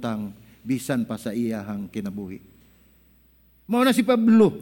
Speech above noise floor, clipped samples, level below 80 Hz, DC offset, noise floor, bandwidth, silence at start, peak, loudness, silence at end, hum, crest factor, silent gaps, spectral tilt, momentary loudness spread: 36 dB; under 0.1%; -60 dBFS; under 0.1%; -58 dBFS; 17 kHz; 0 s; -6 dBFS; -23 LUFS; 0 s; none; 18 dB; none; -6 dB/octave; 19 LU